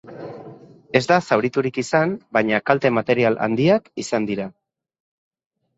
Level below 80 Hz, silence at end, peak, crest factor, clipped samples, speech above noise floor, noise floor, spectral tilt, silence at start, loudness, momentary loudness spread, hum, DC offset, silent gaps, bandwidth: -60 dBFS; 1.3 s; 0 dBFS; 20 dB; under 0.1%; 23 dB; -43 dBFS; -6 dB/octave; 0.05 s; -20 LUFS; 15 LU; none; under 0.1%; none; 8.2 kHz